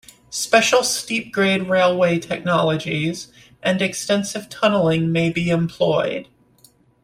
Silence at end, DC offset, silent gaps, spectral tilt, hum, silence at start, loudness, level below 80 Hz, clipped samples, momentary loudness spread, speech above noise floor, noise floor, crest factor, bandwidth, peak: 0.8 s; under 0.1%; none; -4.5 dB/octave; none; 0.3 s; -19 LUFS; -56 dBFS; under 0.1%; 9 LU; 35 dB; -55 dBFS; 20 dB; 16 kHz; 0 dBFS